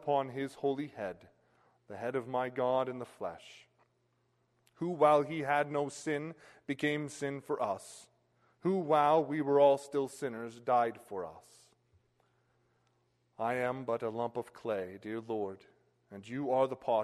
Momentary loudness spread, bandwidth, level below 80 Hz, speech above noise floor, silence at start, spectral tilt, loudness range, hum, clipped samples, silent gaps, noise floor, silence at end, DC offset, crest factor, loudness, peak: 16 LU; 13 kHz; -78 dBFS; 42 dB; 0 s; -6 dB/octave; 8 LU; none; under 0.1%; none; -76 dBFS; 0 s; under 0.1%; 20 dB; -34 LUFS; -14 dBFS